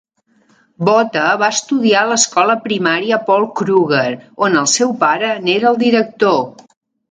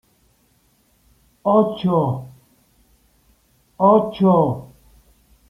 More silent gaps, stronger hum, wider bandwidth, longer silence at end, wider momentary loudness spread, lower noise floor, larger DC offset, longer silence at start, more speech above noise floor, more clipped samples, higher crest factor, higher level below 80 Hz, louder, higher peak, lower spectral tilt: neither; neither; first, 9.6 kHz vs 5.6 kHz; second, 0.6 s vs 0.85 s; second, 4 LU vs 11 LU; second, -56 dBFS vs -60 dBFS; neither; second, 0.8 s vs 1.45 s; about the same, 42 dB vs 44 dB; neither; about the same, 14 dB vs 18 dB; second, -62 dBFS vs -56 dBFS; first, -14 LUFS vs -18 LUFS; about the same, 0 dBFS vs -2 dBFS; second, -3 dB/octave vs -9.5 dB/octave